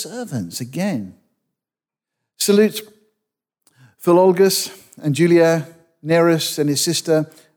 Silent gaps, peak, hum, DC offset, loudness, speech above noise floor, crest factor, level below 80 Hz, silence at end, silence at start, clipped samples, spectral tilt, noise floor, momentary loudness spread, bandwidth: none; -4 dBFS; none; under 0.1%; -17 LUFS; 72 dB; 16 dB; -70 dBFS; 0.3 s; 0 s; under 0.1%; -4.5 dB/octave; -89 dBFS; 14 LU; over 20 kHz